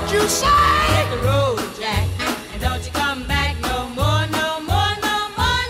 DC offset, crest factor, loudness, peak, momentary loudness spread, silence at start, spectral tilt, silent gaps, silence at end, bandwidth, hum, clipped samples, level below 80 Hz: under 0.1%; 14 dB; -19 LUFS; -4 dBFS; 9 LU; 0 s; -4 dB/octave; none; 0 s; 16 kHz; none; under 0.1%; -30 dBFS